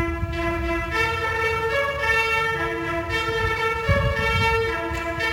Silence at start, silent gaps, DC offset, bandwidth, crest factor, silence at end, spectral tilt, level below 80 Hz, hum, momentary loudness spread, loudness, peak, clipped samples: 0 s; none; under 0.1%; 19 kHz; 16 dB; 0 s; -5 dB/octave; -34 dBFS; none; 6 LU; -22 LUFS; -8 dBFS; under 0.1%